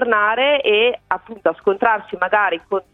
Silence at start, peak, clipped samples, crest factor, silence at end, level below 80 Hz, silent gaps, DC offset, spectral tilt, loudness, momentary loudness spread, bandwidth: 0 s; 0 dBFS; under 0.1%; 18 dB; 0.1 s; -58 dBFS; none; under 0.1%; -5.5 dB/octave; -17 LUFS; 8 LU; 4.1 kHz